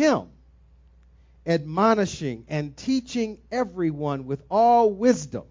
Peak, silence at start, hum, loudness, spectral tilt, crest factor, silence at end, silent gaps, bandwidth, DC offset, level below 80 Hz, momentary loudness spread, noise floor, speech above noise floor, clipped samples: -6 dBFS; 0 s; none; -24 LUFS; -6 dB/octave; 18 dB; 0.1 s; none; 7.6 kHz; under 0.1%; -54 dBFS; 11 LU; -54 dBFS; 31 dB; under 0.1%